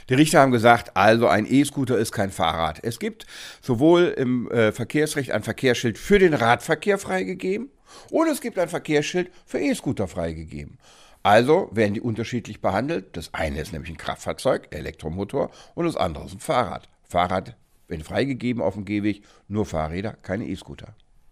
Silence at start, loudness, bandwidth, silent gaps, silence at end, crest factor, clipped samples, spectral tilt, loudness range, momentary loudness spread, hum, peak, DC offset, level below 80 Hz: 0.05 s; -23 LUFS; 15.5 kHz; none; 0.4 s; 22 dB; under 0.1%; -5.5 dB/octave; 7 LU; 15 LU; none; 0 dBFS; under 0.1%; -46 dBFS